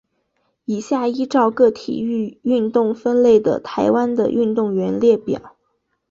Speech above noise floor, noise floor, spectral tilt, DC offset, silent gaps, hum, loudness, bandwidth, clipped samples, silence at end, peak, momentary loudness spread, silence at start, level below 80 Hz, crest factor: 52 dB; -69 dBFS; -7 dB/octave; under 0.1%; none; none; -18 LUFS; 7.4 kHz; under 0.1%; 0.6 s; -2 dBFS; 10 LU; 0.7 s; -58 dBFS; 16 dB